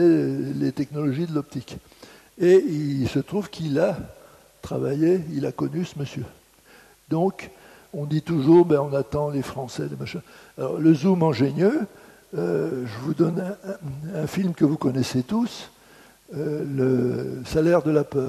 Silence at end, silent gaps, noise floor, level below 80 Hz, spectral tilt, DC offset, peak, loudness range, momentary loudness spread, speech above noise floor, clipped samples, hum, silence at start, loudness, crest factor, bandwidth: 0 s; none; -53 dBFS; -54 dBFS; -7.5 dB/octave; under 0.1%; -6 dBFS; 4 LU; 16 LU; 30 dB; under 0.1%; none; 0 s; -23 LUFS; 18 dB; 13.5 kHz